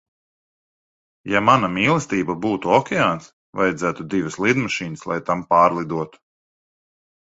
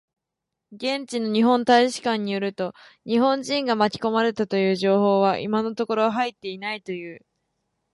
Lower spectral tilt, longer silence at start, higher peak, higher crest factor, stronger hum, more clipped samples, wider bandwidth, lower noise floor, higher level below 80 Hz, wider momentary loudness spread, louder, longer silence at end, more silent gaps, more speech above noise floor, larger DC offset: about the same, -5.5 dB/octave vs -5 dB/octave; first, 1.25 s vs 0.7 s; first, 0 dBFS vs -6 dBFS; first, 22 dB vs 16 dB; neither; neither; second, 8 kHz vs 11.5 kHz; first, under -90 dBFS vs -84 dBFS; first, -56 dBFS vs -68 dBFS; about the same, 11 LU vs 13 LU; first, -20 LUFS vs -23 LUFS; first, 1.3 s vs 0.75 s; first, 3.33-3.53 s vs none; first, over 70 dB vs 61 dB; neither